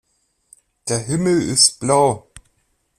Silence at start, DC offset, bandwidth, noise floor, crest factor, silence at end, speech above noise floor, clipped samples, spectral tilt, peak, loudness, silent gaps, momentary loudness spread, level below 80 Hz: 0.85 s; under 0.1%; 15 kHz; -66 dBFS; 20 dB; 0.8 s; 49 dB; under 0.1%; -3.5 dB/octave; 0 dBFS; -16 LUFS; none; 13 LU; -52 dBFS